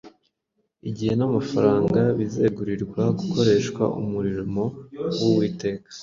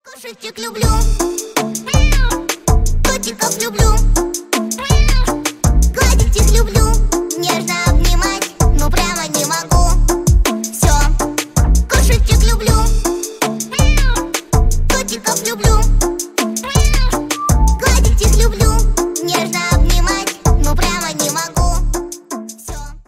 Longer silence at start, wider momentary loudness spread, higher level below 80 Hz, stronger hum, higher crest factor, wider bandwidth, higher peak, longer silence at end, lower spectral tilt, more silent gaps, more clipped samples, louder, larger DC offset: about the same, 0.05 s vs 0.05 s; first, 10 LU vs 6 LU; second, -52 dBFS vs -14 dBFS; neither; first, 18 dB vs 12 dB; second, 7.6 kHz vs 16 kHz; second, -4 dBFS vs 0 dBFS; about the same, 0 s vs 0.05 s; first, -7 dB/octave vs -4 dB/octave; neither; neither; second, -23 LUFS vs -15 LUFS; neither